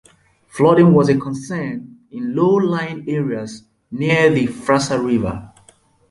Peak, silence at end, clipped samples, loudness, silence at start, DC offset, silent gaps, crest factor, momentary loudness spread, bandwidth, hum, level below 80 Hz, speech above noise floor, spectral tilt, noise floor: -2 dBFS; 0.65 s; under 0.1%; -17 LUFS; 0.55 s; under 0.1%; none; 16 dB; 20 LU; 11.5 kHz; none; -48 dBFS; 36 dB; -6.5 dB/octave; -53 dBFS